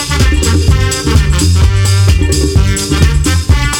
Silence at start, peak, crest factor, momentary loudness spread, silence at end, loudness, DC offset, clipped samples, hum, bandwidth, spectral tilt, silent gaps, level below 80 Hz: 0 s; 0 dBFS; 8 dB; 2 LU; 0 s; -10 LUFS; under 0.1%; under 0.1%; none; 17.5 kHz; -4.5 dB/octave; none; -14 dBFS